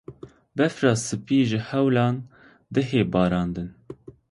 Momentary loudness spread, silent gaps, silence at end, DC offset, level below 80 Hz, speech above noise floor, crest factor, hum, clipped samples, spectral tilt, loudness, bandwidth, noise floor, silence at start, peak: 19 LU; none; 0.4 s; under 0.1%; -50 dBFS; 21 dB; 18 dB; none; under 0.1%; -6 dB/octave; -23 LUFS; 11.5 kHz; -44 dBFS; 0.1 s; -6 dBFS